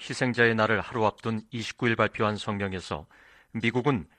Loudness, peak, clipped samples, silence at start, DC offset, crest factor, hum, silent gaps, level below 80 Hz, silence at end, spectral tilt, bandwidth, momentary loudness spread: -27 LUFS; -6 dBFS; under 0.1%; 0 s; under 0.1%; 20 dB; none; none; -58 dBFS; 0.15 s; -5.5 dB/octave; 10.5 kHz; 12 LU